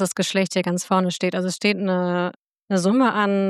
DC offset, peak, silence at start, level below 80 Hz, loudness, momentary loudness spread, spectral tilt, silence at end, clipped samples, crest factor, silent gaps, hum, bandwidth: under 0.1%; -6 dBFS; 0 s; -76 dBFS; -21 LUFS; 5 LU; -5 dB/octave; 0 s; under 0.1%; 16 dB; 2.38-2.46 s, 2.62-2.66 s; none; 13.5 kHz